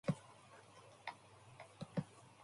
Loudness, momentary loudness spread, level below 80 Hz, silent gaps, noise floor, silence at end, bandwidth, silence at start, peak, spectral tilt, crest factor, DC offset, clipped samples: -49 LUFS; 15 LU; -74 dBFS; none; -62 dBFS; 0 s; 11.5 kHz; 0.05 s; -26 dBFS; -6.5 dB/octave; 24 dB; under 0.1%; under 0.1%